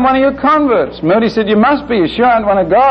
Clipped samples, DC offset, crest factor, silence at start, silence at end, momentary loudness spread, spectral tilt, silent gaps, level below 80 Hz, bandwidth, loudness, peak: under 0.1%; under 0.1%; 8 dB; 0 s; 0 s; 3 LU; -7.5 dB/octave; none; -38 dBFS; 6.4 kHz; -11 LUFS; -2 dBFS